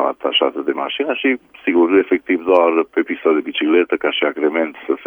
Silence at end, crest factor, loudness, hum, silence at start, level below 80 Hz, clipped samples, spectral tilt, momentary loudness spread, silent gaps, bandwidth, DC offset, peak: 0 s; 16 dB; -17 LUFS; none; 0 s; -64 dBFS; under 0.1%; -6 dB/octave; 7 LU; none; 3.7 kHz; under 0.1%; -2 dBFS